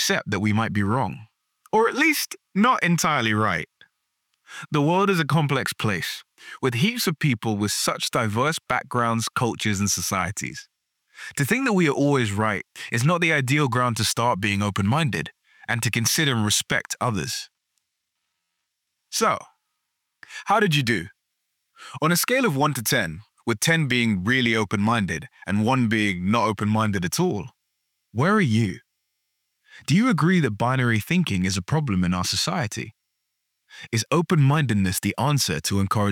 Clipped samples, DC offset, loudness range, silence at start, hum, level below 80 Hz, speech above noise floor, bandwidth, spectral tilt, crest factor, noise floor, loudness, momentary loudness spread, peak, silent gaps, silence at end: under 0.1%; under 0.1%; 3 LU; 0 s; none; -58 dBFS; 57 dB; 19 kHz; -4.5 dB/octave; 18 dB; -79 dBFS; -22 LUFS; 11 LU; -6 dBFS; none; 0 s